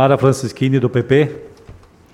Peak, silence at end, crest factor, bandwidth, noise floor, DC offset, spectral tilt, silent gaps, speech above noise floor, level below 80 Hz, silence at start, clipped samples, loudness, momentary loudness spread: 0 dBFS; 0.4 s; 16 dB; 12.5 kHz; -42 dBFS; under 0.1%; -7 dB/octave; none; 27 dB; -50 dBFS; 0 s; under 0.1%; -16 LUFS; 7 LU